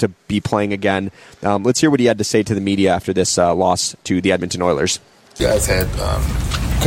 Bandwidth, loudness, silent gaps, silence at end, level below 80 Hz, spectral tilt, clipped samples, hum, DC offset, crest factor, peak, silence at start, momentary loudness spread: 16.5 kHz; -17 LUFS; none; 0 s; -28 dBFS; -4.5 dB/octave; under 0.1%; none; under 0.1%; 16 dB; -2 dBFS; 0 s; 6 LU